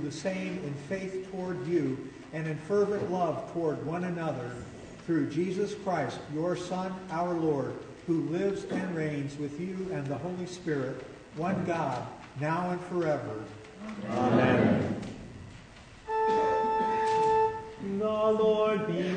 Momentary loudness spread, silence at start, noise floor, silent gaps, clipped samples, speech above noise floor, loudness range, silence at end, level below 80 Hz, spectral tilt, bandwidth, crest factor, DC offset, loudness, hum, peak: 15 LU; 0 s; -50 dBFS; none; under 0.1%; 20 dB; 5 LU; 0 s; -60 dBFS; -7 dB/octave; 9.6 kHz; 18 dB; under 0.1%; -31 LUFS; none; -12 dBFS